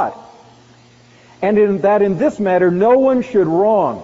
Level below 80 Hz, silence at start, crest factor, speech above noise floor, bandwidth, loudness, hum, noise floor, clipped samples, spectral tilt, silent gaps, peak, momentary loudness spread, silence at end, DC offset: -54 dBFS; 0 s; 12 dB; 33 dB; 7.6 kHz; -14 LUFS; none; -47 dBFS; under 0.1%; -7 dB/octave; none; -2 dBFS; 5 LU; 0 s; under 0.1%